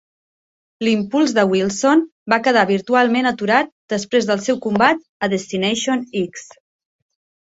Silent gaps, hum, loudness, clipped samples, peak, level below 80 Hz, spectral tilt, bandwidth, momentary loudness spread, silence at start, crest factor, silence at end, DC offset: 2.12-2.26 s, 3.72-3.88 s, 5.09-5.20 s; none; -18 LUFS; under 0.1%; -2 dBFS; -60 dBFS; -4.5 dB/octave; 8 kHz; 8 LU; 0.8 s; 18 dB; 1.15 s; under 0.1%